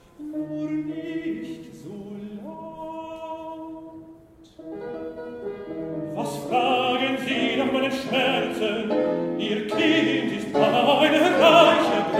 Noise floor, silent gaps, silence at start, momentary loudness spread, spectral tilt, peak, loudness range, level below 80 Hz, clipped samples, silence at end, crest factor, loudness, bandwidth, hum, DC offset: -49 dBFS; none; 0.2 s; 19 LU; -4.5 dB/octave; -2 dBFS; 17 LU; -60 dBFS; under 0.1%; 0 s; 22 dB; -22 LUFS; 16 kHz; none; under 0.1%